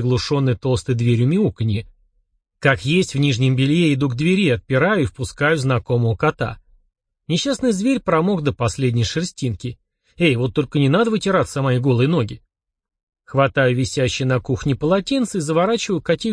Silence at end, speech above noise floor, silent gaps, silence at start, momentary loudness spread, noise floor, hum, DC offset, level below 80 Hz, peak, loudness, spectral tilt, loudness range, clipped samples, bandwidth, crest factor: 0 s; 48 dB; 13.03-13.07 s; 0 s; 7 LU; -66 dBFS; none; under 0.1%; -46 dBFS; -2 dBFS; -19 LUFS; -6 dB/octave; 3 LU; under 0.1%; 10.5 kHz; 16 dB